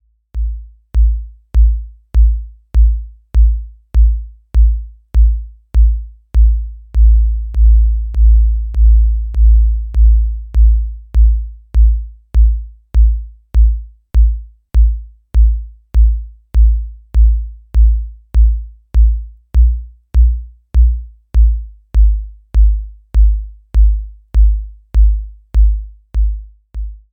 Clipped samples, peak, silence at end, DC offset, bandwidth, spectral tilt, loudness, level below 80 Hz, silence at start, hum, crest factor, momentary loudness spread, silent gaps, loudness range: under 0.1%; -2 dBFS; 0.15 s; under 0.1%; 1 kHz; -9 dB/octave; -16 LUFS; -12 dBFS; 0.35 s; none; 10 dB; 12 LU; none; 3 LU